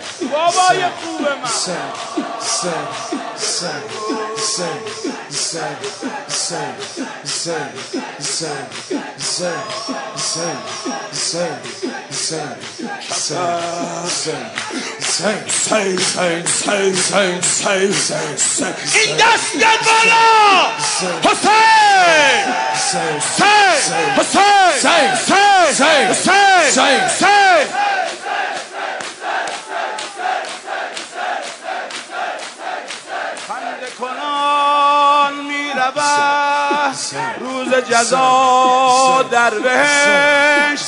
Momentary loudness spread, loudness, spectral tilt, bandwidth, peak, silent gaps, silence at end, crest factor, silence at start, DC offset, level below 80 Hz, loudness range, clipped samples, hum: 14 LU; -15 LUFS; -1.5 dB/octave; 11 kHz; 0 dBFS; none; 0 s; 14 dB; 0 s; under 0.1%; -64 dBFS; 11 LU; under 0.1%; none